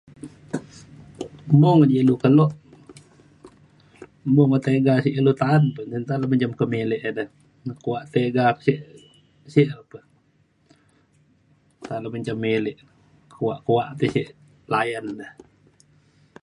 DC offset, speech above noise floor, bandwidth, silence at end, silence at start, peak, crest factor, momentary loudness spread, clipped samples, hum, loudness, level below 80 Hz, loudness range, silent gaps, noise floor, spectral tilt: under 0.1%; 42 dB; 10.5 kHz; 1.15 s; 0.25 s; -4 dBFS; 20 dB; 20 LU; under 0.1%; none; -21 LUFS; -60 dBFS; 9 LU; none; -63 dBFS; -8.5 dB/octave